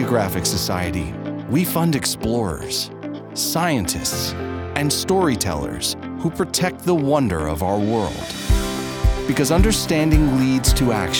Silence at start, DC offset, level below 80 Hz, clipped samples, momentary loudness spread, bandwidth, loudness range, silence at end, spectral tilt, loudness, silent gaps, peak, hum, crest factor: 0 s; under 0.1%; -28 dBFS; under 0.1%; 8 LU; over 20 kHz; 3 LU; 0 s; -4.5 dB/octave; -20 LUFS; none; -2 dBFS; none; 18 dB